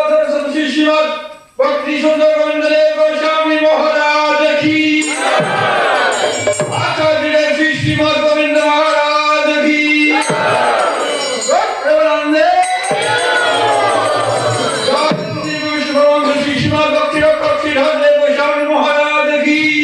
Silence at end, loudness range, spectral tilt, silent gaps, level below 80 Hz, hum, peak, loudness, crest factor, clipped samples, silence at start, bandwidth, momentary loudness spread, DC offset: 0 s; 2 LU; -4 dB/octave; none; -50 dBFS; none; -2 dBFS; -12 LUFS; 12 dB; under 0.1%; 0 s; 12 kHz; 4 LU; under 0.1%